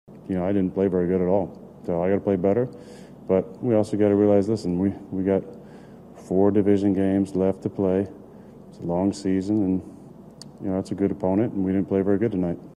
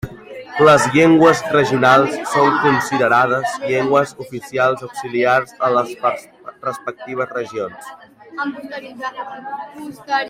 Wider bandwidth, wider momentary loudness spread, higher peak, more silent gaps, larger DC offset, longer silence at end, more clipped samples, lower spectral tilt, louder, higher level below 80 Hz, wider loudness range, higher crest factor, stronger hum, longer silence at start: second, 10.5 kHz vs 16 kHz; second, 14 LU vs 18 LU; second, -6 dBFS vs 0 dBFS; neither; neither; about the same, 0.05 s vs 0 s; neither; first, -8.5 dB/octave vs -5 dB/octave; second, -23 LUFS vs -16 LUFS; about the same, -58 dBFS vs -54 dBFS; second, 4 LU vs 13 LU; about the same, 16 dB vs 16 dB; neither; about the same, 0.1 s vs 0.05 s